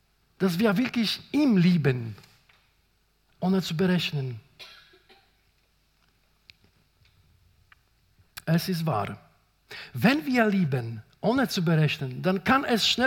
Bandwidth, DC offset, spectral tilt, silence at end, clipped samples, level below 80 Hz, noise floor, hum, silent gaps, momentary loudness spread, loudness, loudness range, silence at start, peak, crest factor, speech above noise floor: 17 kHz; under 0.1%; -6 dB/octave; 0 s; under 0.1%; -64 dBFS; -68 dBFS; none; none; 20 LU; -25 LUFS; 8 LU; 0.4 s; -6 dBFS; 20 dB; 43 dB